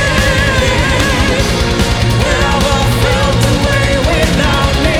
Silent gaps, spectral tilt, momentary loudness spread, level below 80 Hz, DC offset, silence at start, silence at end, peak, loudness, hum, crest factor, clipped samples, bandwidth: none; -4.5 dB/octave; 1 LU; -18 dBFS; under 0.1%; 0 s; 0 s; 0 dBFS; -11 LUFS; none; 10 dB; under 0.1%; 17.5 kHz